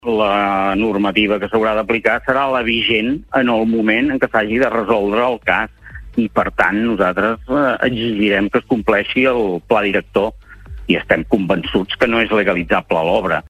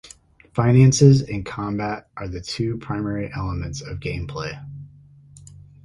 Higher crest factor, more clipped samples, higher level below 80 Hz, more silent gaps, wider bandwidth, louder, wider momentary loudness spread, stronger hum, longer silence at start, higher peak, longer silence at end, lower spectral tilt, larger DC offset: about the same, 16 dB vs 20 dB; neither; about the same, -40 dBFS vs -42 dBFS; neither; first, 13.5 kHz vs 11.5 kHz; first, -16 LUFS vs -21 LUFS; second, 4 LU vs 17 LU; neither; about the same, 0.05 s vs 0.05 s; about the same, 0 dBFS vs 0 dBFS; second, 0 s vs 0.4 s; about the same, -6.5 dB/octave vs -6.5 dB/octave; neither